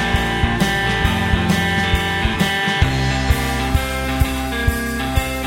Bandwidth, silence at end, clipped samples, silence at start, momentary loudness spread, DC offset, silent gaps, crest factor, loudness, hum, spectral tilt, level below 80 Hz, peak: 16.5 kHz; 0 s; under 0.1%; 0 s; 3 LU; under 0.1%; none; 16 dB; -18 LUFS; none; -5 dB/octave; -24 dBFS; -2 dBFS